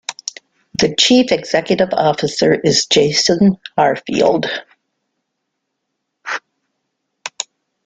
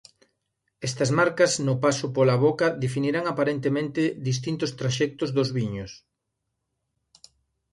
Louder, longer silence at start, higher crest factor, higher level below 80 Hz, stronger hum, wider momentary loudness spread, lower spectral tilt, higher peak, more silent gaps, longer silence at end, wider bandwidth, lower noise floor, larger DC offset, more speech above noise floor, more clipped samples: first, -14 LUFS vs -24 LUFS; second, 0.1 s vs 0.8 s; about the same, 18 dB vs 20 dB; first, -54 dBFS vs -60 dBFS; neither; first, 16 LU vs 8 LU; second, -3.5 dB/octave vs -5.5 dB/octave; first, 0 dBFS vs -6 dBFS; neither; second, 0.45 s vs 1.75 s; second, 9.4 kHz vs 11.5 kHz; second, -74 dBFS vs -80 dBFS; neither; first, 60 dB vs 56 dB; neither